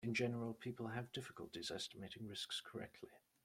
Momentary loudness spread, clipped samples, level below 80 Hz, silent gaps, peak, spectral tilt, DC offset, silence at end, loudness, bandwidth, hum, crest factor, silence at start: 11 LU; under 0.1%; -78 dBFS; none; -28 dBFS; -4.5 dB/octave; under 0.1%; 0.25 s; -47 LUFS; 16 kHz; none; 20 dB; 0 s